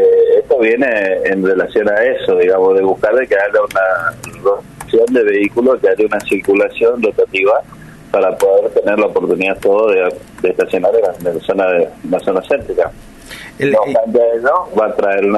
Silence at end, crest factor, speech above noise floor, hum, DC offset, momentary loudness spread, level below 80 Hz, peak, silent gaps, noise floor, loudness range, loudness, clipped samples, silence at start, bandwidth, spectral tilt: 0 s; 10 dB; 20 dB; none; under 0.1%; 6 LU; -46 dBFS; -2 dBFS; none; -33 dBFS; 3 LU; -13 LUFS; under 0.1%; 0 s; 12.5 kHz; -5.5 dB/octave